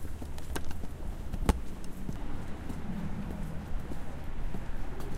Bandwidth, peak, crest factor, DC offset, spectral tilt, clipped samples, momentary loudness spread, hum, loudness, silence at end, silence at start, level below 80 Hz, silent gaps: 15.5 kHz; -10 dBFS; 22 dB; 0.4%; -6 dB/octave; under 0.1%; 9 LU; none; -40 LUFS; 0 s; 0 s; -38 dBFS; none